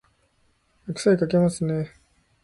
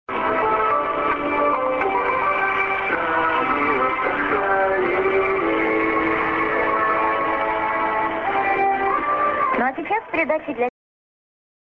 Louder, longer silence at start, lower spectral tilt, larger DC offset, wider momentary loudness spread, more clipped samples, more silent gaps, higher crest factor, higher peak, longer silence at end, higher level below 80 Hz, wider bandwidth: second, -23 LUFS vs -20 LUFS; first, 0.85 s vs 0.1 s; about the same, -6.5 dB/octave vs -7 dB/octave; neither; first, 16 LU vs 3 LU; neither; neither; about the same, 18 dB vs 14 dB; about the same, -8 dBFS vs -6 dBFS; second, 0.55 s vs 1 s; second, -56 dBFS vs -50 dBFS; first, 11.5 kHz vs 6.6 kHz